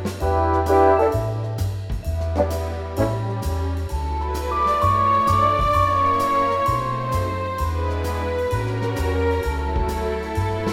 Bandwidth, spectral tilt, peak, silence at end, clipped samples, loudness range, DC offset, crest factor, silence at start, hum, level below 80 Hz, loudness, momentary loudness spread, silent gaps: 16.5 kHz; -6.5 dB/octave; -4 dBFS; 0 s; under 0.1%; 5 LU; under 0.1%; 16 dB; 0 s; none; -30 dBFS; -21 LUFS; 8 LU; none